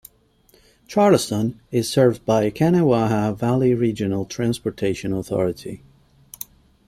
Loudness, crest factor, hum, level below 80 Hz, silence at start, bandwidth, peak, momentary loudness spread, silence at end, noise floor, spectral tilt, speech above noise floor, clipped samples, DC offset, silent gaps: -20 LUFS; 18 dB; none; -52 dBFS; 0.9 s; 16 kHz; -2 dBFS; 18 LU; 1.1 s; -57 dBFS; -6.5 dB/octave; 38 dB; under 0.1%; under 0.1%; none